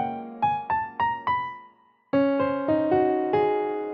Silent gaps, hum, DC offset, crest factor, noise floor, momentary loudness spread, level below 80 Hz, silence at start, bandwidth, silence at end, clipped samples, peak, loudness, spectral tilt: none; none; under 0.1%; 14 dB; -56 dBFS; 6 LU; -62 dBFS; 0 s; 5.4 kHz; 0 s; under 0.1%; -10 dBFS; -25 LUFS; -9 dB/octave